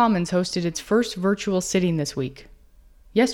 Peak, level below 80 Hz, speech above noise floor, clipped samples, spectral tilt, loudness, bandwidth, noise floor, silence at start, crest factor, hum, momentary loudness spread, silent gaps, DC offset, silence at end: -6 dBFS; -50 dBFS; 29 dB; under 0.1%; -5 dB/octave; -24 LUFS; 16.5 kHz; -52 dBFS; 0 s; 16 dB; none; 6 LU; none; under 0.1%; 0 s